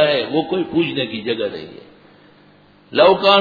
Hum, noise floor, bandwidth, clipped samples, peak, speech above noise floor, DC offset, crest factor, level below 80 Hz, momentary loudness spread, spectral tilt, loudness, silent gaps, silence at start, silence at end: 50 Hz at -50 dBFS; -50 dBFS; 5 kHz; under 0.1%; 0 dBFS; 33 dB; under 0.1%; 18 dB; -58 dBFS; 13 LU; -7 dB/octave; -17 LUFS; none; 0 s; 0 s